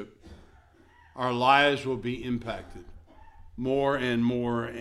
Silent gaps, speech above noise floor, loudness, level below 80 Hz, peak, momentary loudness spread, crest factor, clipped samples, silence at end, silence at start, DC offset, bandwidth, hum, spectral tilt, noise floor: none; 31 dB; -27 LUFS; -52 dBFS; -6 dBFS; 23 LU; 22 dB; under 0.1%; 0 s; 0 s; under 0.1%; 12 kHz; none; -6 dB/octave; -57 dBFS